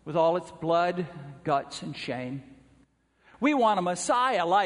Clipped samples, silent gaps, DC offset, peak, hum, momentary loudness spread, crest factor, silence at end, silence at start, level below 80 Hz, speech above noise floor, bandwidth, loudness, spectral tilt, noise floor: under 0.1%; none; under 0.1%; -12 dBFS; none; 13 LU; 16 dB; 0 s; 0.05 s; -66 dBFS; 38 dB; 10.5 kHz; -27 LUFS; -4.5 dB/octave; -64 dBFS